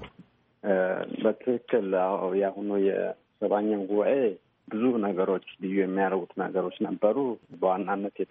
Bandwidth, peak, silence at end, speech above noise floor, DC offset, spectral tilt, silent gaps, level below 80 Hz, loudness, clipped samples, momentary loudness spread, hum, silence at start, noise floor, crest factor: 3.8 kHz; -10 dBFS; 0.05 s; 30 dB; under 0.1%; -6 dB/octave; none; -72 dBFS; -28 LUFS; under 0.1%; 6 LU; none; 0 s; -57 dBFS; 18 dB